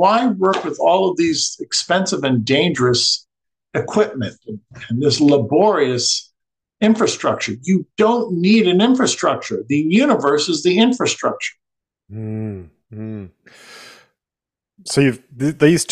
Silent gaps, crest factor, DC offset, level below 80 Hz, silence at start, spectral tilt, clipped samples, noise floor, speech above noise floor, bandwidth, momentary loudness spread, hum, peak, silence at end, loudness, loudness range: none; 18 dB; under 0.1%; -58 dBFS; 0 s; -4.5 dB/octave; under 0.1%; -88 dBFS; 72 dB; 13 kHz; 14 LU; none; 0 dBFS; 0 s; -17 LUFS; 9 LU